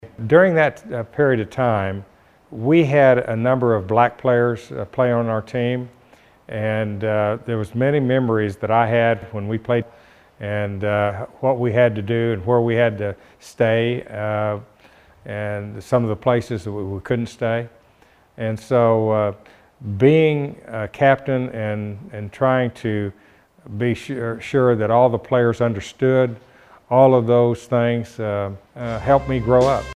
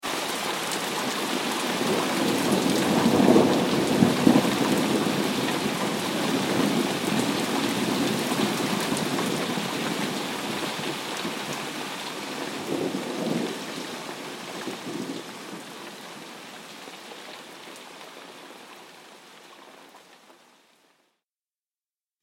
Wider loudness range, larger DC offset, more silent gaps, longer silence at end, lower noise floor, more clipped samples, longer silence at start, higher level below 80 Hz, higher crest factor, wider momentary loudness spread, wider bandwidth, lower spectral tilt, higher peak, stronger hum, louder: second, 6 LU vs 20 LU; neither; neither; second, 0 s vs 2.05 s; second, -54 dBFS vs under -90 dBFS; neither; about the same, 0.05 s vs 0 s; first, -48 dBFS vs -64 dBFS; about the same, 20 dB vs 24 dB; second, 13 LU vs 19 LU; second, 11.5 kHz vs 17 kHz; first, -8 dB/octave vs -4 dB/octave; first, 0 dBFS vs -4 dBFS; neither; first, -19 LUFS vs -25 LUFS